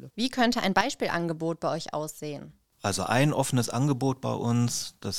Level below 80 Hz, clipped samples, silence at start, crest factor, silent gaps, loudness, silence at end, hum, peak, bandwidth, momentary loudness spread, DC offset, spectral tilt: -58 dBFS; under 0.1%; 0 s; 20 dB; none; -27 LUFS; 0 s; none; -8 dBFS; 16.5 kHz; 10 LU; 0.3%; -5 dB/octave